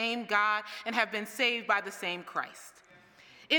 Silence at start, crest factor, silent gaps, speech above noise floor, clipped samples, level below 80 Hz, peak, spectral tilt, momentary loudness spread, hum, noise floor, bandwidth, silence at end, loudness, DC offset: 0 s; 22 dB; none; 25 dB; under 0.1%; -84 dBFS; -10 dBFS; -2 dB/octave; 12 LU; none; -57 dBFS; 19.5 kHz; 0 s; -30 LUFS; under 0.1%